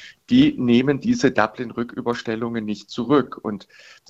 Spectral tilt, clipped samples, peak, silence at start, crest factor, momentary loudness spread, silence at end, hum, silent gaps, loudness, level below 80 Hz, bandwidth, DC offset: -6 dB/octave; under 0.1%; -2 dBFS; 0 s; 20 dB; 12 LU; 0.45 s; none; none; -21 LUFS; -54 dBFS; 7.8 kHz; under 0.1%